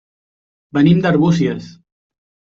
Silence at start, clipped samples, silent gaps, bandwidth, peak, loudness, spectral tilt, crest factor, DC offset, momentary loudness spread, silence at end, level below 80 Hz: 0.75 s; under 0.1%; none; 7.2 kHz; -2 dBFS; -15 LUFS; -8 dB/octave; 14 dB; under 0.1%; 10 LU; 0.85 s; -52 dBFS